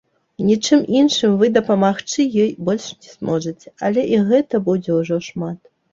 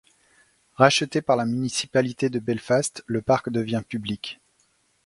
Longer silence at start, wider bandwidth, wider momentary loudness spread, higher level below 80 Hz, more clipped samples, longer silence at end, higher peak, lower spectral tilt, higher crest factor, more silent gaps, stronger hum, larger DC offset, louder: second, 0.4 s vs 0.8 s; second, 7.6 kHz vs 11.5 kHz; about the same, 13 LU vs 12 LU; about the same, -58 dBFS vs -60 dBFS; neither; second, 0.35 s vs 0.7 s; about the same, -2 dBFS vs 0 dBFS; about the same, -5.5 dB/octave vs -4.5 dB/octave; second, 16 dB vs 24 dB; neither; neither; neither; first, -18 LUFS vs -24 LUFS